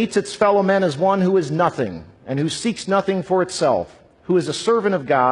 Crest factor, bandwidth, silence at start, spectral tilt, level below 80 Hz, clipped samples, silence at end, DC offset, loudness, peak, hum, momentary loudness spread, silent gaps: 16 dB; 11 kHz; 0 s; -5.5 dB/octave; -56 dBFS; under 0.1%; 0 s; under 0.1%; -19 LUFS; -4 dBFS; none; 8 LU; none